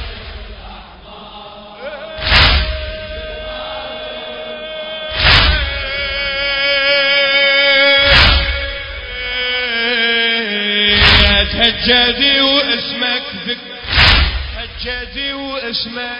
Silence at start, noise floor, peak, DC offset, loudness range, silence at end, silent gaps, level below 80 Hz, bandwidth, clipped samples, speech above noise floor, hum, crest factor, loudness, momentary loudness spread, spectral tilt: 0 s; -35 dBFS; 0 dBFS; under 0.1%; 7 LU; 0 s; none; -24 dBFS; 8 kHz; under 0.1%; 19 dB; none; 16 dB; -12 LUFS; 18 LU; -5 dB/octave